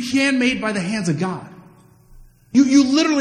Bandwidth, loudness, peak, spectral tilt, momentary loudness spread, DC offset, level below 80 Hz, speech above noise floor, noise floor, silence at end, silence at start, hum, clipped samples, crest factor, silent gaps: 11 kHz; -18 LUFS; -4 dBFS; -4.5 dB/octave; 10 LU; under 0.1%; -52 dBFS; 31 dB; -48 dBFS; 0 s; 0 s; none; under 0.1%; 16 dB; none